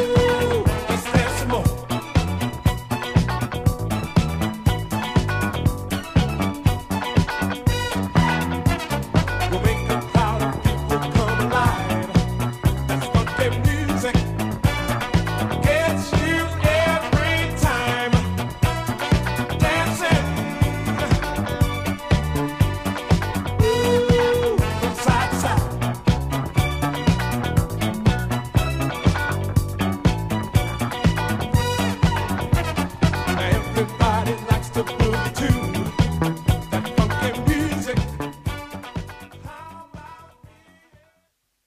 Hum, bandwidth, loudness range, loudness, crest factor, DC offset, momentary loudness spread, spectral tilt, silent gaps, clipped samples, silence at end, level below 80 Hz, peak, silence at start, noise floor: none; 15.5 kHz; 3 LU; -21 LUFS; 18 dB; under 0.1%; 5 LU; -6 dB/octave; none; under 0.1%; 1.4 s; -30 dBFS; -2 dBFS; 0 s; -69 dBFS